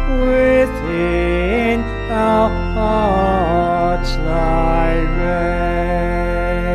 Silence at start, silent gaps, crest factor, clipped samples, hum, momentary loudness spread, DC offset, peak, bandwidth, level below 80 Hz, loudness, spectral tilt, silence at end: 0 s; none; 12 dB; under 0.1%; none; 5 LU; under 0.1%; -4 dBFS; 10.5 kHz; -22 dBFS; -17 LUFS; -7.5 dB/octave; 0 s